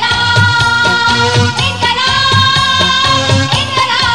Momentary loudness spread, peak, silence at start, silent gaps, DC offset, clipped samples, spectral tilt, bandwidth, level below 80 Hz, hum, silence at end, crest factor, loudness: 3 LU; 0 dBFS; 0 s; none; 1%; under 0.1%; -3.5 dB/octave; 12.5 kHz; -34 dBFS; none; 0 s; 10 dB; -9 LUFS